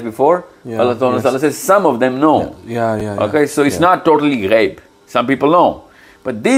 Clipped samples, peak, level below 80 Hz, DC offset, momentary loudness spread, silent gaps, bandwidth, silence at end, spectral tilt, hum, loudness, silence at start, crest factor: under 0.1%; 0 dBFS; -52 dBFS; under 0.1%; 8 LU; none; 16.5 kHz; 0 s; -5.5 dB/octave; none; -14 LUFS; 0 s; 14 dB